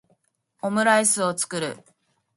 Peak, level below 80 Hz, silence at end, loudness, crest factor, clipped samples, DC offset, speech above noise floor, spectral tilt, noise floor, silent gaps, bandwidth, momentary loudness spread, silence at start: -6 dBFS; -72 dBFS; 0.6 s; -22 LUFS; 20 dB; under 0.1%; under 0.1%; 46 dB; -2.5 dB/octave; -68 dBFS; none; 12 kHz; 14 LU; 0.65 s